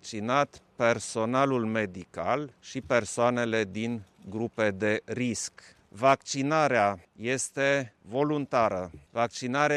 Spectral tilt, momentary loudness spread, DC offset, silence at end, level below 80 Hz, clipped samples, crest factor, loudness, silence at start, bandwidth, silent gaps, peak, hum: -4.5 dB/octave; 10 LU; under 0.1%; 0 s; -64 dBFS; under 0.1%; 20 dB; -28 LUFS; 0.05 s; 13 kHz; none; -10 dBFS; none